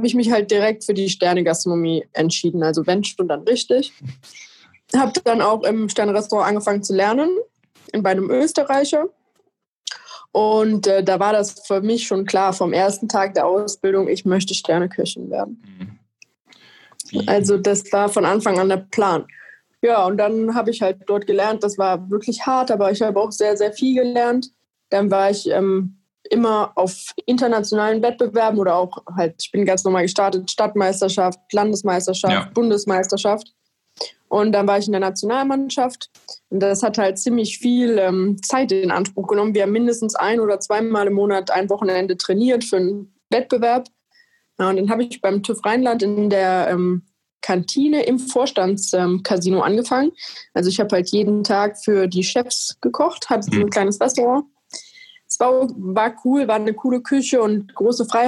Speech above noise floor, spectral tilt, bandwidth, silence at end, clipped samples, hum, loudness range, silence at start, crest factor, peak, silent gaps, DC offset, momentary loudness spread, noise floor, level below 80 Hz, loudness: 48 dB; -4.5 dB/octave; 12 kHz; 0 s; under 0.1%; none; 2 LU; 0 s; 14 dB; -4 dBFS; 9.68-9.82 s, 47.32-47.38 s; under 0.1%; 6 LU; -66 dBFS; -68 dBFS; -19 LUFS